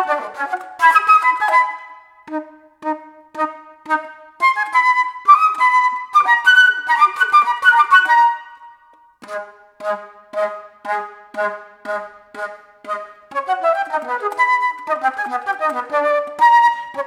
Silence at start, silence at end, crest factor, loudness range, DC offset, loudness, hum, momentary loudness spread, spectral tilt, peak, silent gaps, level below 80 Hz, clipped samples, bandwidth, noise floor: 0 s; 0 s; 16 dB; 13 LU; under 0.1%; -15 LUFS; none; 18 LU; -1 dB/octave; 0 dBFS; none; -74 dBFS; under 0.1%; 15 kHz; -50 dBFS